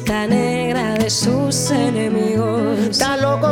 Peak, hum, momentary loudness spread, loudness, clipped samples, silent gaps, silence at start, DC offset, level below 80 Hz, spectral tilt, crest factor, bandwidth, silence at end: -4 dBFS; none; 2 LU; -17 LUFS; under 0.1%; none; 0 s; under 0.1%; -44 dBFS; -4.5 dB/octave; 14 dB; 18 kHz; 0 s